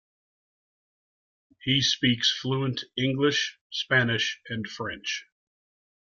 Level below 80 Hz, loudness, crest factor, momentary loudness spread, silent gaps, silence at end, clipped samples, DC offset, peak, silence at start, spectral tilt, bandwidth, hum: -64 dBFS; -26 LUFS; 20 dB; 12 LU; 3.61-3.70 s; 0.85 s; under 0.1%; under 0.1%; -8 dBFS; 1.65 s; -4 dB/octave; 7.4 kHz; none